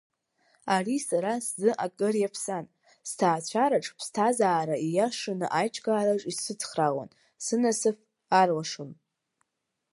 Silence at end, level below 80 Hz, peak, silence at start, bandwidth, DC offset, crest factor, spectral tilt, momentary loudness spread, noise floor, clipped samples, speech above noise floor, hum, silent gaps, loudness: 1 s; -80 dBFS; -8 dBFS; 0.65 s; 11.5 kHz; under 0.1%; 20 dB; -4 dB/octave; 12 LU; -83 dBFS; under 0.1%; 56 dB; none; none; -28 LUFS